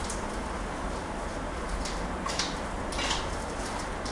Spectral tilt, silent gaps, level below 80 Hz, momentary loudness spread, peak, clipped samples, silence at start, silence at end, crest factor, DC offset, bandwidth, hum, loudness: -3.5 dB/octave; none; -38 dBFS; 5 LU; -14 dBFS; under 0.1%; 0 s; 0 s; 18 dB; under 0.1%; 11.5 kHz; none; -33 LUFS